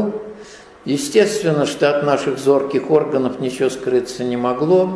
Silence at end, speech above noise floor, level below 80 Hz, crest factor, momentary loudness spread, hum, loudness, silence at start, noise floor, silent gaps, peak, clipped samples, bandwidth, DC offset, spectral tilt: 0 s; 23 dB; -58 dBFS; 16 dB; 8 LU; none; -18 LUFS; 0 s; -40 dBFS; none; -2 dBFS; under 0.1%; 11 kHz; under 0.1%; -5.5 dB/octave